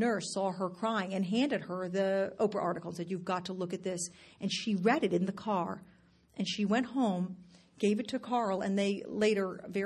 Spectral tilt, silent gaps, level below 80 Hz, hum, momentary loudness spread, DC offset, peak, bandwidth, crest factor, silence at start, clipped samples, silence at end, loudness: -5 dB/octave; none; -72 dBFS; none; 9 LU; under 0.1%; -14 dBFS; 12 kHz; 18 dB; 0 s; under 0.1%; 0 s; -33 LUFS